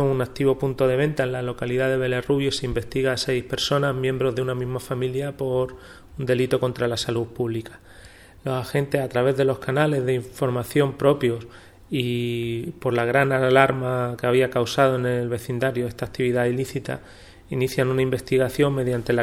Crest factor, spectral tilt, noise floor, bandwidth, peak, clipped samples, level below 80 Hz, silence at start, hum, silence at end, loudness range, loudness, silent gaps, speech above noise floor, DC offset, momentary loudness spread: 22 dB; -6 dB/octave; -46 dBFS; 16.5 kHz; 0 dBFS; under 0.1%; -48 dBFS; 0 s; none; 0 s; 4 LU; -23 LUFS; none; 24 dB; under 0.1%; 8 LU